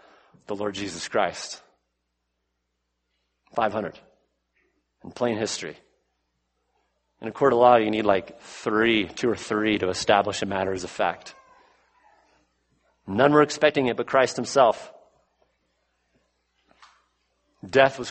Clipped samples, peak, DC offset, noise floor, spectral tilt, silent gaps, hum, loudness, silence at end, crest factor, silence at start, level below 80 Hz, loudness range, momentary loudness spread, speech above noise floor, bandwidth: under 0.1%; -2 dBFS; under 0.1%; -78 dBFS; -4.5 dB/octave; none; none; -23 LUFS; 0 s; 24 dB; 0.5 s; -62 dBFS; 11 LU; 17 LU; 55 dB; 8.8 kHz